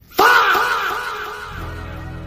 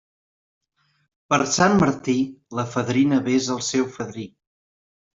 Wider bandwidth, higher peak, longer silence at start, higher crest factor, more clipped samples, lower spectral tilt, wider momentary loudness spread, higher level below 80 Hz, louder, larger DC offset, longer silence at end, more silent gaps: first, 16 kHz vs 7.8 kHz; about the same, -2 dBFS vs -2 dBFS; second, 0.1 s vs 1.3 s; about the same, 18 dB vs 22 dB; neither; second, -3 dB/octave vs -4.5 dB/octave; first, 19 LU vs 14 LU; first, -40 dBFS vs -58 dBFS; first, -16 LUFS vs -21 LUFS; neither; second, 0 s vs 0.9 s; neither